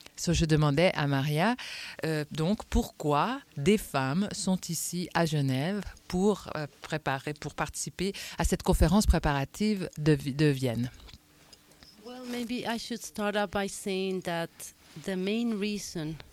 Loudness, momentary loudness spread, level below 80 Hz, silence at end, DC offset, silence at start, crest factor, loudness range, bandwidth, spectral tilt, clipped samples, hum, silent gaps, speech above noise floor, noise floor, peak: -30 LUFS; 11 LU; -40 dBFS; 0.15 s; under 0.1%; 0.15 s; 20 dB; 5 LU; 16.5 kHz; -5.5 dB/octave; under 0.1%; none; none; 29 dB; -58 dBFS; -8 dBFS